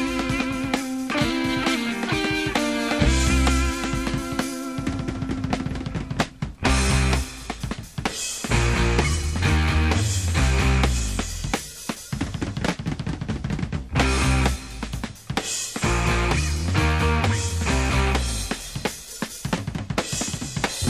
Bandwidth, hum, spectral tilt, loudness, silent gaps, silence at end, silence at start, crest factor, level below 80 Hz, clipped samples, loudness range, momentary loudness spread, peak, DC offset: 15 kHz; none; -4.5 dB/octave; -24 LUFS; none; 0 s; 0 s; 18 dB; -28 dBFS; under 0.1%; 3 LU; 9 LU; -6 dBFS; 0.1%